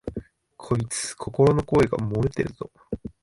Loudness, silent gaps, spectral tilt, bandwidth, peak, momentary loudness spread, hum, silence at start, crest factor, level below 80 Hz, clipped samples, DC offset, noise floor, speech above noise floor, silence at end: -24 LUFS; none; -6 dB/octave; 11.5 kHz; -6 dBFS; 16 LU; none; 0.05 s; 18 dB; -44 dBFS; under 0.1%; under 0.1%; -47 dBFS; 24 dB; 0.15 s